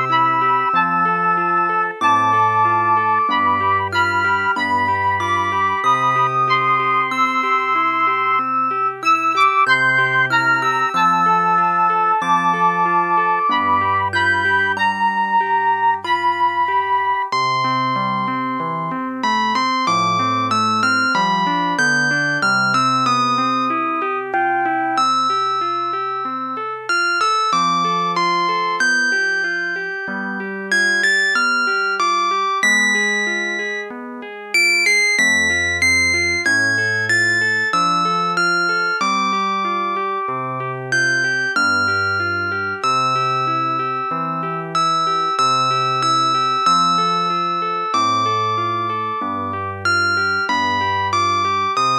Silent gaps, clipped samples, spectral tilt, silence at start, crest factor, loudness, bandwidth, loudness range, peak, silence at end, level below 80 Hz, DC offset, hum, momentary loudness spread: none; under 0.1%; -3 dB/octave; 0 s; 14 dB; -17 LUFS; 13 kHz; 4 LU; -4 dBFS; 0 s; -60 dBFS; under 0.1%; none; 7 LU